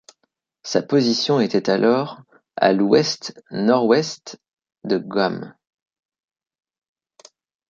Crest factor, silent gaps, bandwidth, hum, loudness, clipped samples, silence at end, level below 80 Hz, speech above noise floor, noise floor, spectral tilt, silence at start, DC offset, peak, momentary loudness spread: 20 dB; 4.53-4.57 s; 7.6 kHz; none; -19 LUFS; under 0.1%; 2.2 s; -66 dBFS; 53 dB; -72 dBFS; -5 dB/octave; 0.65 s; under 0.1%; -2 dBFS; 19 LU